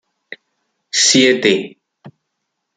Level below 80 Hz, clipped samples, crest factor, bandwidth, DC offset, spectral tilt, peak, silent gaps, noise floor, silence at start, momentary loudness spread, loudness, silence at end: -60 dBFS; under 0.1%; 18 dB; 9.6 kHz; under 0.1%; -2 dB/octave; -2 dBFS; none; -74 dBFS; 0.95 s; 10 LU; -13 LUFS; 0.7 s